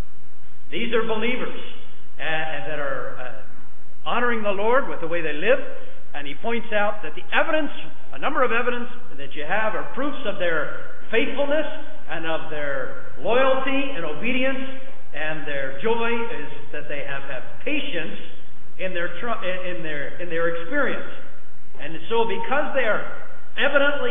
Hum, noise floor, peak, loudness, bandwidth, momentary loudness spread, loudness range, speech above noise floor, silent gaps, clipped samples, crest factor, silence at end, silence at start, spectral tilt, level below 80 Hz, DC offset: none; -53 dBFS; -4 dBFS; -25 LUFS; 3.8 kHz; 16 LU; 4 LU; 28 dB; none; under 0.1%; 22 dB; 0 s; 0.7 s; -9.5 dB/octave; -60 dBFS; 20%